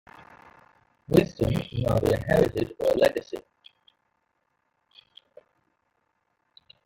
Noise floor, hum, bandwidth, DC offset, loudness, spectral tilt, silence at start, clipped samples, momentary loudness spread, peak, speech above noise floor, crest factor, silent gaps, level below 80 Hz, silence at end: -75 dBFS; none; 17 kHz; under 0.1%; -25 LUFS; -7 dB/octave; 1.1 s; under 0.1%; 9 LU; -6 dBFS; 51 dB; 24 dB; none; -48 dBFS; 3.45 s